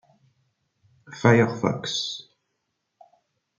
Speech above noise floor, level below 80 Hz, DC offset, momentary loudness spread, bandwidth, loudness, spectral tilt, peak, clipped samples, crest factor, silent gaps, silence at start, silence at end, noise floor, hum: 56 dB; -68 dBFS; under 0.1%; 17 LU; 7.6 kHz; -23 LUFS; -5.5 dB/octave; -4 dBFS; under 0.1%; 24 dB; none; 1.1 s; 1.4 s; -78 dBFS; none